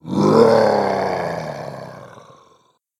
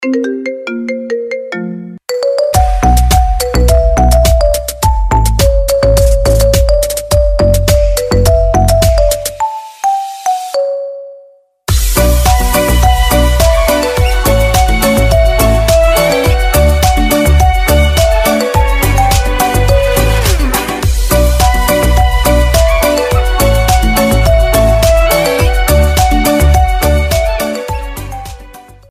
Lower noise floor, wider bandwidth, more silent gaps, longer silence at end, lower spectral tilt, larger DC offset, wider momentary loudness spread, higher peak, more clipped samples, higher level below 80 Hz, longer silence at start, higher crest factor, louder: first, -58 dBFS vs -42 dBFS; second, 13 kHz vs 16 kHz; neither; first, 0.9 s vs 0.3 s; first, -6.5 dB/octave vs -5 dB/octave; neither; first, 20 LU vs 9 LU; about the same, 0 dBFS vs 0 dBFS; second, under 0.1% vs 0.1%; second, -58 dBFS vs -12 dBFS; about the same, 0.05 s vs 0 s; first, 18 dB vs 10 dB; second, -16 LUFS vs -11 LUFS